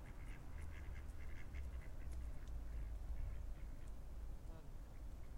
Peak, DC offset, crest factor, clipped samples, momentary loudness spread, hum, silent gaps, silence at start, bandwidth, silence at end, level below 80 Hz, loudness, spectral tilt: -36 dBFS; under 0.1%; 12 dB; under 0.1%; 6 LU; none; none; 0 s; 16 kHz; 0 s; -50 dBFS; -54 LUFS; -6.5 dB/octave